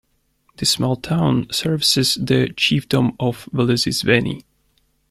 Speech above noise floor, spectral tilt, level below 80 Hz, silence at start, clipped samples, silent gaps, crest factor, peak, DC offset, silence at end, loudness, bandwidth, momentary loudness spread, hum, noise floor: 45 dB; -4.5 dB/octave; -48 dBFS; 0.6 s; under 0.1%; none; 18 dB; -2 dBFS; under 0.1%; 0.7 s; -18 LUFS; 15.5 kHz; 5 LU; none; -63 dBFS